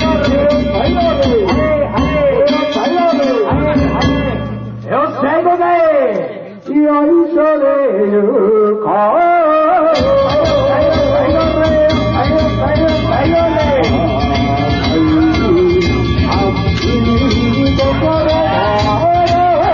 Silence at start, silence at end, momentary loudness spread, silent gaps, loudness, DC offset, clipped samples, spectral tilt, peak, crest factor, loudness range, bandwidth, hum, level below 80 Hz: 0 s; 0 s; 3 LU; none; -12 LUFS; under 0.1%; under 0.1%; -7.5 dB/octave; -2 dBFS; 10 dB; 2 LU; 7.2 kHz; none; -26 dBFS